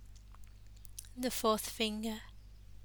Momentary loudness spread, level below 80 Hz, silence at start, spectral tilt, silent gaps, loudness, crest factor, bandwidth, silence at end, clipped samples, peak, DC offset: 25 LU; -56 dBFS; 0 s; -3 dB/octave; none; -36 LUFS; 22 dB; over 20 kHz; 0 s; under 0.1%; -16 dBFS; under 0.1%